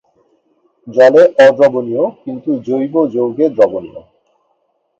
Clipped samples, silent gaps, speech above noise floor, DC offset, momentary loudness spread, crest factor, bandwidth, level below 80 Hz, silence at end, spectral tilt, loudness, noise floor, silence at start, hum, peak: under 0.1%; none; 51 dB; under 0.1%; 13 LU; 14 dB; 7.8 kHz; -60 dBFS; 1 s; -6.5 dB/octave; -12 LUFS; -63 dBFS; 0.85 s; none; 0 dBFS